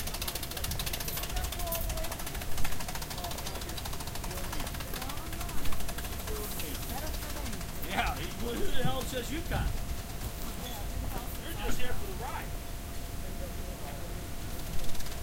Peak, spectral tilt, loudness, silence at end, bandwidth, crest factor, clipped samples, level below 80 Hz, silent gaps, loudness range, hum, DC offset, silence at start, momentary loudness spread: -16 dBFS; -3.5 dB/octave; -37 LUFS; 0 s; 17 kHz; 16 dB; under 0.1%; -38 dBFS; none; 4 LU; none; 0.3%; 0 s; 7 LU